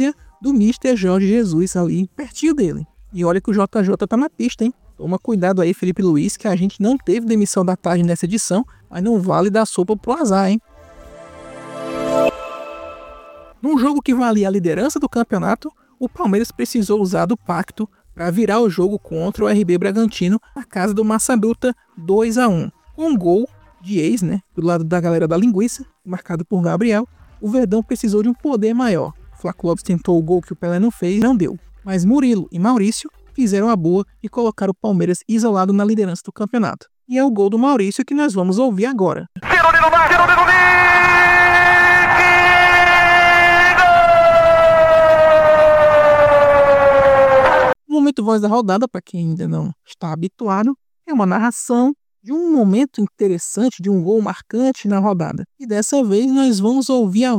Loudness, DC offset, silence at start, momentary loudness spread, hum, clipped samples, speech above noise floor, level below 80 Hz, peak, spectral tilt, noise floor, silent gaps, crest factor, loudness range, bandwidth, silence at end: -15 LUFS; under 0.1%; 0 s; 15 LU; none; under 0.1%; 24 dB; -44 dBFS; -2 dBFS; -5.5 dB/octave; -41 dBFS; none; 12 dB; 10 LU; 16 kHz; 0 s